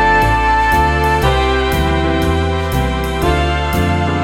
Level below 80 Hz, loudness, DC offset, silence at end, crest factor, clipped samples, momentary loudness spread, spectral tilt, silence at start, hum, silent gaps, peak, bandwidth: -22 dBFS; -14 LUFS; 0.2%; 0 s; 12 dB; under 0.1%; 5 LU; -6 dB/octave; 0 s; none; none; -2 dBFS; 17 kHz